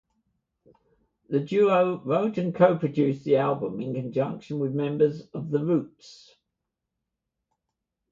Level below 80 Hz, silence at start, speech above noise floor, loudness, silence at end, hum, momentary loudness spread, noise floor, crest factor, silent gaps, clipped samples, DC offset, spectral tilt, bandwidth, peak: -70 dBFS; 1.3 s; 59 dB; -25 LUFS; 1.95 s; none; 9 LU; -84 dBFS; 22 dB; none; under 0.1%; under 0.1%; -8.5 dB/octave; 7.4 kHz; -6 dBFS